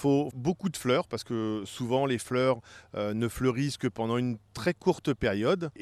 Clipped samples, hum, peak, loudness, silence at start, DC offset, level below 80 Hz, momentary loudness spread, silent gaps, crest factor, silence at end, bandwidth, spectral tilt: under 0.1%; none; -12 dBFS; -30 LUFS; 0 s; under 0.1%; -56 dBFS; 6 LU; none; 18 dB; 0 s; 13.5 kHz; -6 dB/octave